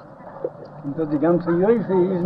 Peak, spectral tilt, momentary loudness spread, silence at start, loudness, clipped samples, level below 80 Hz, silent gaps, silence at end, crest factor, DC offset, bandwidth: -6 dBFS; -11 dB/octave; 14 LU; 0 s; -20 LUFS; under 0.1%; -58 dBFS; none; 0 s; 16 dB; under 0.1%; 5 kHz